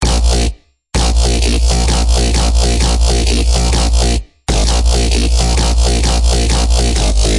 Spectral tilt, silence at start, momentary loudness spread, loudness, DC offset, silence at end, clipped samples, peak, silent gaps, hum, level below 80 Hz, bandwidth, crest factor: -4 dB/octave; 0 s; 3 LU; -13 LUFS; 0.7%; 0 s; under 0.1%; -2 dBFS; none; none; -12 dBFS; 11.5 kHz; 10 dB